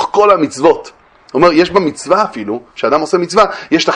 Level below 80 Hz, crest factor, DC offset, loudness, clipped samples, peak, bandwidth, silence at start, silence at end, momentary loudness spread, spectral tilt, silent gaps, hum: -48 dBFS; 12 dB; under 0.1%; -12 LUFS; 0.2%; 0 dBFS; 10.5 kHz; 0 s; 0 s; 9 LU; -4.5 dB/octave; none; none